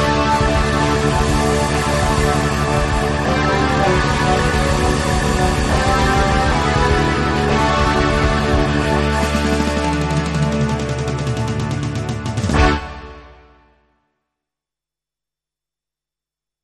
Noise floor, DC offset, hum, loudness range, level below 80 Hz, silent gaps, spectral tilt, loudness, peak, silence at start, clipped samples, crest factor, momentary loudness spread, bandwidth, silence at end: -88 dBFS; under 0.1%; none; 6 LU; -24 dBFS; none; -5.5 dB/octave; -17 LUFS; -2 dBFS; 0 s; under 0.1%; 16 dB; 6 LU; 13 kHz; 3.3 s